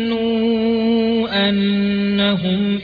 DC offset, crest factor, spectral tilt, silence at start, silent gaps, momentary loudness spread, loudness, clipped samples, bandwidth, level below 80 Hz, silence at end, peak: under 0.1%; 12 dB; -8.5 dB/octave; 0 s; none; 2 LU; -17 LUFS; under 0.1%; 5 kHz; -48 dBFS; 0 s; -4 dBFS